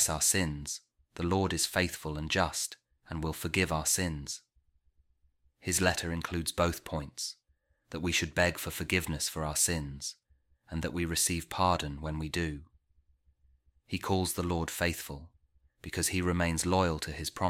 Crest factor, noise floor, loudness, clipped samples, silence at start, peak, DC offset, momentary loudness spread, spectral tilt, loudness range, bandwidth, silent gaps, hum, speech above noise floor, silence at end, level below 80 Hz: 22 dB; -74 dBFS; -31 LUFS; under 0.1%; 0 s; -12 dBFS; under 0.1%; 12 LU; -3.5 dB/octave; 3 LU; 16.5 kHz; none; none; 42 dB; 0 s; -48 dBFS